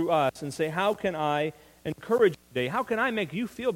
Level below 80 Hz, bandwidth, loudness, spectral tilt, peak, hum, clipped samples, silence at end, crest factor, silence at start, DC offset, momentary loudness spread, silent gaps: -62 dBFS; 16.5 kHz; -28 LUFS; -5.5 dB/octave; -10 dBFS; none; under 0.1%; 0 s; 18 dB; 0 s; under 0.1%; 9 LU; none